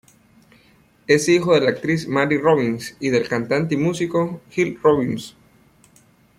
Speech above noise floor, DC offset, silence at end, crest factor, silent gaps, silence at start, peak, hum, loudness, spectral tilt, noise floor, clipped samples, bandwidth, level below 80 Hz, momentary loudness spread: 36 dB; under 0.1%; 1.1 s; 20 dB; none; 1.1 s; -2 dBFS; none; -19 LUFS; -5.5 dB/octave; -55 dBFS; under 0.1%; 15 kHz; -58 dBFS; 9 LU